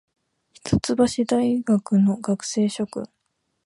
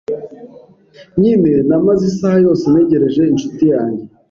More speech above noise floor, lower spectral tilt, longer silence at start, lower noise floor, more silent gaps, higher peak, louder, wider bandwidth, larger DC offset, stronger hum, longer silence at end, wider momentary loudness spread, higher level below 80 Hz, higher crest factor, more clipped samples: first, 53 dB vs 31 dB; second, -6 dB/octave vs -8.5 dB/octave; first, 0.65 s vs 0.1 s; first, -74 dBFS vs -43 dBFS; neither; second, -6 dBFS vs -2 dBFS; second, -22 LUFS vs -13 LUFS; first, 11.5 kHz vs 7.4 kHz; neither; neither; first, 0.6 s vs 0.25 s; about the same, 11 LU vs 12 LU; about the same, -50 dBFS vs -48 dBFS; first, 18 dB vs 12 dB; neither